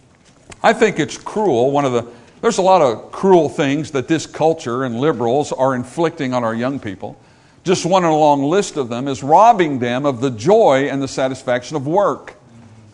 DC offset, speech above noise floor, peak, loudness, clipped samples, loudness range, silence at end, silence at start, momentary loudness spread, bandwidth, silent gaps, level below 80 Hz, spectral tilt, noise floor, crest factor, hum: under 0.1%; 33 dB; 0 dBFS; -16 LUFS; under 0.1%; 4 LU; 0.6 s; 0.5 s; 10 LU; 11 kHz; none; -56 dBFS; -5.5 dB/octave; -48 dBFS; 16 dB; none